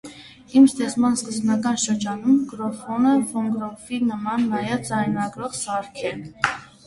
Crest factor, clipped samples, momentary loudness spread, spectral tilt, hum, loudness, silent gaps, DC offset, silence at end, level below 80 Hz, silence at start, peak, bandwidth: 22 dB; under 0.1%; 11 LU; -4.5 dB/octave; none; -22 LUFS; none; under 0.1%; 0.2 s; -58 dBFS; 0.05 s; 0 dBFS; 11.5 kHz